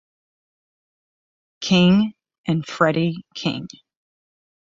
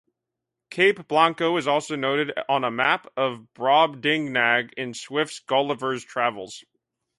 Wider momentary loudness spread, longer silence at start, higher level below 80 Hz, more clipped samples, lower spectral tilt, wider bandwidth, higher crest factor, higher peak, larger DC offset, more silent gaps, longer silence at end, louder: first, 16 LU vs 9 LU; first, 1.6 s vs 0.7 s; first, -56 dBFS vs -72 dBFS; neither; first, -6 dB/octave vs -4 dB/octave; second, 7.6 kHz vs 11.5 kHz; about the same, 20 dB vs 20 dB; about the same, -4 dBFS vs -4 dBFS; neither; first, 2.38-2.44 s vs none; first, 1 s vs 0.6 s; first, -20 LUFS vs -23 LUFS